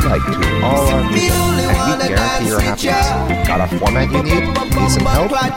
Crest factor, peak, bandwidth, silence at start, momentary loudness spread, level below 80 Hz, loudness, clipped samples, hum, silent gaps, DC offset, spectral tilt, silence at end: 14 dB; 0 dBFS; 17 kHz; 0 s; 2 LU; -22 dBFS; -15 LUFS; under 0.1%; none; none; 0.5%; -5 dB/octave; 0 s